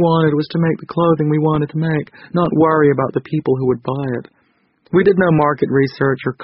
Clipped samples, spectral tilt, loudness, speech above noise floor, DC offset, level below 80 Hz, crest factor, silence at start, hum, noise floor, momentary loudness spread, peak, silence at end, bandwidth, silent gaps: under 0.1%; -7 dB/octave; -16 LUFS; 44 dB; under 0.1%; -48 dBFS; 14 dB; 0 s; none; -60 dBFS; 8 LU; -2 dBFS; 0 s; 5.8 kHz; none